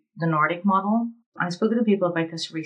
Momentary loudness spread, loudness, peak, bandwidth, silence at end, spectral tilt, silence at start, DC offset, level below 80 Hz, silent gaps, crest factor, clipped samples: 8 LU; -23 LUFS; -8 dBFS; 9.8 kHz; 0 s; -6.5 dB/octave; 0.15 s; under 0.1%; under -90 dBFS; 1.26-1.32 s; 16 dB; under 0.1%